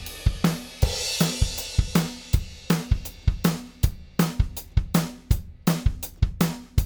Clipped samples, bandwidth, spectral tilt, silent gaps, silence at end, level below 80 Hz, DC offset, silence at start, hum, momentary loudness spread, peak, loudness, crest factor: under 0.1%; over 20 kHz; -5 dB/octave; none; 0 s; -28 dBFS; under 0.1%; 0 s; none; 5 LU; -6 dBFS; -26 LUFS; 18 dB